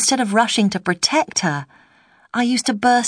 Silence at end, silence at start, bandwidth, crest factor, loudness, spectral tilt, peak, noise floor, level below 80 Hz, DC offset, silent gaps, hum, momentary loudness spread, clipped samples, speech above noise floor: 0 s; 0 s; 10.5 kHz; 18 dB; -18 LUFS; -3 dB/octave; -2 dBFS; -54 dBFS; -62 dBFS; under 0.1%; none; none; 7 LU; under 0.1%; 36 dB